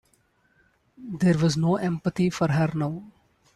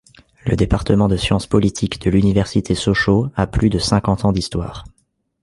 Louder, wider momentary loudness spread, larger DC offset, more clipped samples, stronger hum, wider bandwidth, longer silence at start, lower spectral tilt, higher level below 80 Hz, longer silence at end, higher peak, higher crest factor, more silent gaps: second, -24 LUFS vs -17 LUFS; first, 16 LU vs 8 LU; neither; neither; neither; about the same, 12 kHz vs 11.5 kHz; first, 1 s vs 0.45 s; about the same, -7 dB/octave vs -6 dB/octave; second, -58 dBFS vs -32 dBFS; second, 0.45 s vs 0.6 s; second, -10 dBFS vs -2 dBFS; about the same, 16 dB vs 16 dB; neither